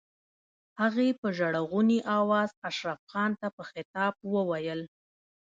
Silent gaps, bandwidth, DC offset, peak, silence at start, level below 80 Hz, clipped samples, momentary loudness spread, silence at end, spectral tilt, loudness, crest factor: 1.18-1.23 s, 2.57-2.62 s, 2.99-3.07 s, 3.53-3.58 s, 3.85-3.94 s; 7.6 kHz; under 0.1%; -14 dBFS; 0.75 s; -76 dBFS; under 0.1%; 11 LU; 0.65 s; -6.5 dB/octave; -29 LUFS; 16 dB